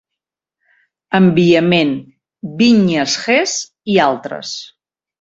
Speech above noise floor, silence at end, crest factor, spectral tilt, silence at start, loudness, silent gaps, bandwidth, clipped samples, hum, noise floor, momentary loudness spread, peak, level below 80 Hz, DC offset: 69 dB; 0.55 s; 14 dB; -5 dB/octave; 1.1 s; -14 LUFS; none; 7.8 kHz; under 0.1%; none; -82 dBFS; 15 LU; -2 dBFS; -56 dBFS; under 0.1%